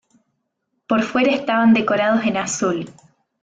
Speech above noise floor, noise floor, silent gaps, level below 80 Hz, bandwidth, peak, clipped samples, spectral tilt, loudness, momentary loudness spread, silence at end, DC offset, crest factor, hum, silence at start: 56 dB; -73 dBFS; none; -62 dBFS; 9.4 kHz; -6 dBFS; under 0.1%; -4.5 dB/octave; -18 LUFS; 7 LU; 0.5 s; under 0.1%; 14 dB; none; 0.9 s